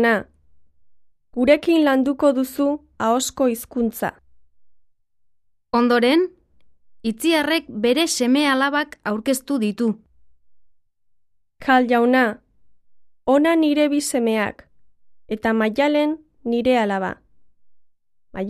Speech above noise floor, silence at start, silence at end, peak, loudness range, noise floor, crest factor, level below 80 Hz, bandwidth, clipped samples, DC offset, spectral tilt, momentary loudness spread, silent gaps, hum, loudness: 48 dB; 0 s; 0 s; -2 dBFS; 4 LU; -67 dBFS; 18 dB; -56 dBFS; 14 kHz; under 0.1%; under 0.1%; -4 dB/octave; 12 LU; none; none; -20 LUFS